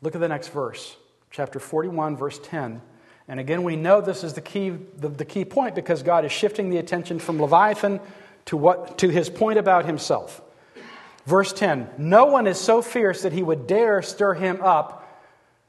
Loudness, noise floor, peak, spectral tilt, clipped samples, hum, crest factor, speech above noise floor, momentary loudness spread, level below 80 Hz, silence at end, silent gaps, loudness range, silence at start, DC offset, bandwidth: -22 LUFS; -56 dBFS; -2 dBFS; -5.5 dB/octave; under 0.1%; none; 20 dB; 34 dB; 14 LU; -68 dBFS; 0.6 s; none; 6 LU; 0 s; under 0.1%; 12.5 kHz